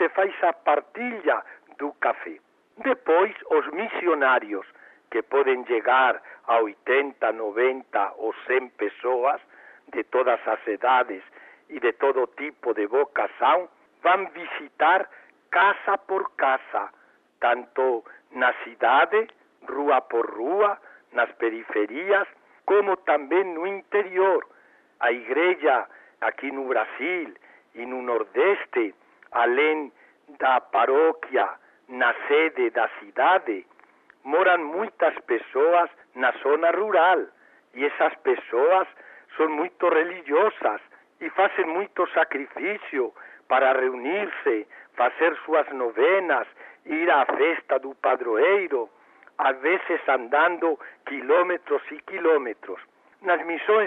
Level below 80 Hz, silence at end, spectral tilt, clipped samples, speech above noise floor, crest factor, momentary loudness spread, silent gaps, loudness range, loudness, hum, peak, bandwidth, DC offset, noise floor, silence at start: -78 dBFS; 0 s; -6 dB/octave; under 0.1%; 33 dB; 16 dB; 12 LU; none; 3 LU; -24 LUFS; none; -8 dBFS; 4 kHz; under 0.1%; -56 dBFS; 0 s